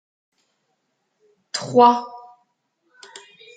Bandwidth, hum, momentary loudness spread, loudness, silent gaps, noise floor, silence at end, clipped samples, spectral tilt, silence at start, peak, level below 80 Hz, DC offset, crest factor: 9.2 kHz; none; 28 LU; -18 LUFS; none; -72 dBFS; 1.4 s; under 0.1%; -4.5 dB/octave; 1.55 s; -2 dBFS; -76 dBFS; under 0.1%; 22 dB